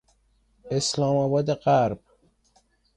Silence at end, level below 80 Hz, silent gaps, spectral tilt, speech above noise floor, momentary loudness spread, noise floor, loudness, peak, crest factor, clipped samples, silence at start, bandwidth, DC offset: 1 s; -58 dBFS; none; -5.5 dB/octave; 42 dB; 8 LU; -65 dBFS; -24 LUFS; -10 dBFS; 16 dB; under 0.1%; 0.65 s; 11 kHz; under 0.1%